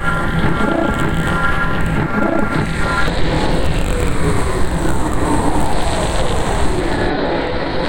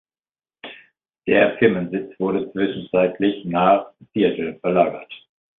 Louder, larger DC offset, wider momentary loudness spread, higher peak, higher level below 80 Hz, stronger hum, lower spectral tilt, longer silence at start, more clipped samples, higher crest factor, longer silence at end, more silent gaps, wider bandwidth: about the same, -18 LUFS vs -20 LUFS; neither; second, 2 LU vs 21 LU; about the same, -2 dBFS vs -2 dBFS; first, -22 dBFS vs -58 dBFS; neither; second, -5.5 dB/octave vs -11 dB/octave; second, 0 s vs 0.65 s; neither; second, 12 dB vs 20 dB; second, 0 s vs 0.45 s; neither; first, 17 kHz vs 4.1 kHz